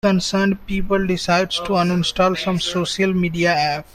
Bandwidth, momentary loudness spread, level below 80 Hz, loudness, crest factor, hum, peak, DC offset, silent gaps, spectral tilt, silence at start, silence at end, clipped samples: 13 kHz; 3 LU; -40 dBFS; -19 LUFS; 16 dB; none; -4 dBFS; under 0.1%; none; -5 dB/octave; 0.05 s; 0.1 s; under 0.1%